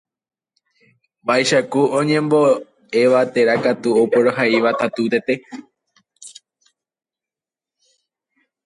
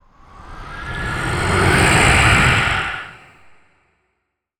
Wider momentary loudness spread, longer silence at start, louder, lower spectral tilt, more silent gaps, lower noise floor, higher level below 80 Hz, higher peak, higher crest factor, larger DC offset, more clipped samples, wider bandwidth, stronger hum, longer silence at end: second, 14 LU vs 21 LU; first, 1.25 s vs 0.35 s; about the same, -17 LUFS vs -15 LUFS; about the same, -5 dB/octave vs -4 dB/octave; neither; first, -90 dBFS vs -73 dBFS; second, -66 dBFS vs -30 dBFS; about the same, -4 dBFS vs -2 dBFS; about the same, 16 dB vs 18 dB; neither; neither; second, 11.5 kHz vs 19.5 kHz; neither; first, 2.35 s vs 1.45 s